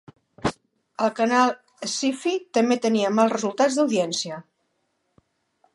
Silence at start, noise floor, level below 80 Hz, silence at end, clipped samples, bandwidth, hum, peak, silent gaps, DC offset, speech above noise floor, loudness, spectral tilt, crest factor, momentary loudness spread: 0.45 s; -73 dBFS; -60 dBFS; 1.35 s; under 0.1%; 11.5 kHz; none; -6 dBFS; none; under 0.1%; 51 dB; -23 LUFS; -4 dB/octave; 18 dB; 10 LU